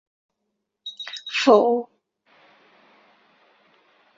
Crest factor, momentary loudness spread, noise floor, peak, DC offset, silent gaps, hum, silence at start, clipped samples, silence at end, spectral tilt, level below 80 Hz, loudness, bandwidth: 22 dB; 22 LU; -78 dBFS; -2 dBFS; under 0.1%; none; none; 0.85 s; under 0.1%; 2.35 s; -3.5 dB/octave; -74 dBFS; -20 LUFS; 7.8 kHz